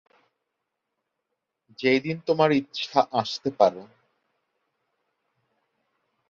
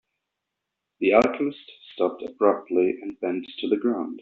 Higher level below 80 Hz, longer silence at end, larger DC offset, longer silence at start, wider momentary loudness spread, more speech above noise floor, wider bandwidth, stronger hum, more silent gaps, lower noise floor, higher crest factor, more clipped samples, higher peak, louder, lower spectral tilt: second, -72 dBFS vs -66 dBFS; first, 2.45 s vs 0 s; neither; first, 1.8 s vs 1 s; second, 6 LU vs 10 LU; about the same, 58 dB vs 59 dB; about the same, 7.4 kHz vs 7.4 kHz; neither; neither; about the same, -82 dBFS vs -83 dBFS; about the same, 24 dB vs 22 dB; neither; about the same, -4 dBFS vs -2 dBFS; about the same, -24 LUFS vs -24 LUFS; first, -5.5 dB/octave vs -3.5 dB/octave